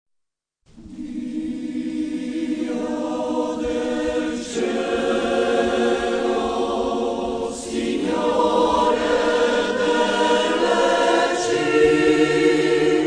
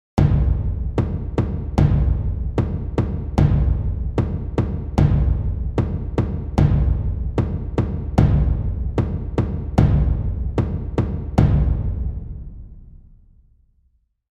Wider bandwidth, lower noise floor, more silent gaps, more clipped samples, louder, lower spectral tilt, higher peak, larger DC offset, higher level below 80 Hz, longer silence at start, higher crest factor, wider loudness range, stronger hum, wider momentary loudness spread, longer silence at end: first, 10 kHz vs 7.2 kHz; first, -76 dBFS vs -63 dBFS; neither; neither; about the same, -20 LUFS vs -21 LUFS; second, -4 dB/octave vs -9.5 dB/octave; second, -4 dBFS vs 0 dBFS; neither; second, -48 dBFS vs -24 dBFS; first, 0.75 s vs 0.15 s; about the same, 16 dB vs 18 dB; first, 7 LU vs 2 LU; neither; first, 9 LU vs 6 LU; second, 0 s vs 1.4 s